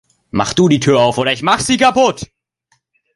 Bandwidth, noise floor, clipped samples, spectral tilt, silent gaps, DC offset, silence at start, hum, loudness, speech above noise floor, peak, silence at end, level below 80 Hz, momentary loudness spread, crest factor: 11.5 kHz; -63 dBFS; under 0.1%; -4.5 dB/octave; none; under 0.1%; 0.35 s; none; -13 LUFS; 50 dB; 0 dBFS; 0.9 s; -46 dBFS; 11 LU; 14 dB